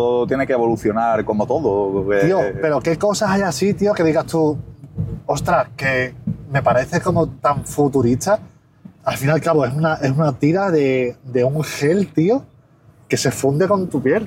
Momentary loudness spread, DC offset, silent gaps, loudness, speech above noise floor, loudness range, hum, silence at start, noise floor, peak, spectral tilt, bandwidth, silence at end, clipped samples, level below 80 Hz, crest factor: 6 LU; under 0.1%; none; -18 LUFS; 32 dB; 2 LU; none; 0 s; -50 dBFS; -4 dBFS; -6 dB/octave; 16.5 kHz; 0 s; under 0.1%; -46 dBFS; 14 dB